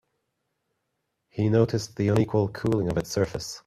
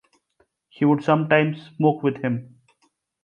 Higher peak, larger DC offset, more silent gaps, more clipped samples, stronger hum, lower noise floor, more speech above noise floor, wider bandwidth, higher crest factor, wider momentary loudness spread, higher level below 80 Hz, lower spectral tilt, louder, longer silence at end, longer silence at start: about the same, -6 dBFS vs -4 dBFS; neither; neither; neither; neither; first, -79 dBFS vs -68 dBFS; first, 54 dB vs 47 dB; first, 14 kHz vs 7 kHz; about the same, 20 dB vs 20 dB; second, 6 LU vs 9 LU; first, -52 dBFS vs -66 dBFS; second, -6.5 dB/octave vs -8.5 dB/octave; second, -25 LUFS vs -21 LUFS; second, 0.05 s vs 0.8 s; first, 1.35 s vs 0.8 s